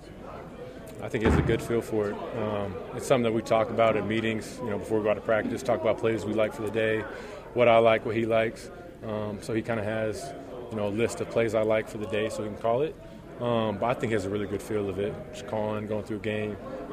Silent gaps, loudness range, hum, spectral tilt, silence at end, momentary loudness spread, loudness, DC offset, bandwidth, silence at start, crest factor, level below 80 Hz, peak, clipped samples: none; 5 LU; none; -6 dB/octave; 0 s; 14 LU; -28 LUFS; under 0.1%; 15 kHz; 0 s; 20 dB; -48 dBFS; -8 dBFS; under 0.1%